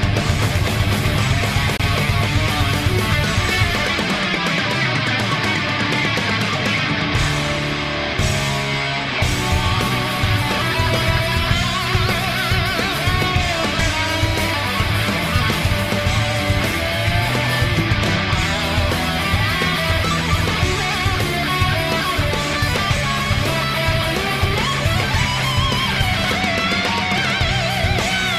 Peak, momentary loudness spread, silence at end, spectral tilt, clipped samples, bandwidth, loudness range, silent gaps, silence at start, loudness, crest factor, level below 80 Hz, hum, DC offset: -2 dBFS; 1 LU; 0 s; -4.5 dB/octave; under 0.1%; 15.5 kHz; 1 LU; none; 0 s; -18 LUFS; 16 dB; -30 dBFS; none; 0.1%